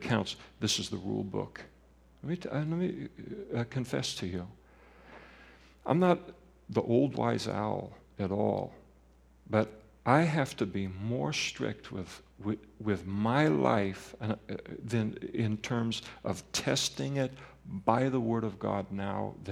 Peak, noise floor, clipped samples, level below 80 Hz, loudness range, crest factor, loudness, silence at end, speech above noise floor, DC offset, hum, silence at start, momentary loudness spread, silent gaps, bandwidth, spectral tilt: -8 dBFS; -61 dBFS; under 0.1%; -62 dBFS; 5 LU; 24 dB; -32 LUFS; 0 s; 29 dB; under 0.1%; none; 0 s; 15 LU; none; 16 kHz; -5.5 dB/octave